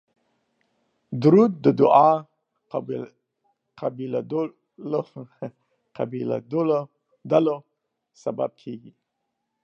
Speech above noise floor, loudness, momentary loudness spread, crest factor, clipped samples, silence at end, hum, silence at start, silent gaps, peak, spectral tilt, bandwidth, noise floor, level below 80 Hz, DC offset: 57 dB; -23 LUFS; 22 LU; 22 dB; under 0.1%; 0.85 s; none; 1.1 s; none; -2 dBFS; -9 dB/octave; 7.2 kHz; -79 dBFS; -76 dBFS; under 0.1%